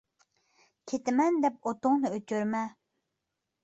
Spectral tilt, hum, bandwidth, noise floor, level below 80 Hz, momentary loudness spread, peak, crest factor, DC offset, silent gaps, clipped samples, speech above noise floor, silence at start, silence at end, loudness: -6 dB/octave; none; 8.2 kHz; -85 dBFS; -76 dBFS; 8 LU; -14 dBFS; 16 dB; under 0.1%; none; under 0.1%; 56 dB; 0.85 s; 0.95 s; -30 LUFS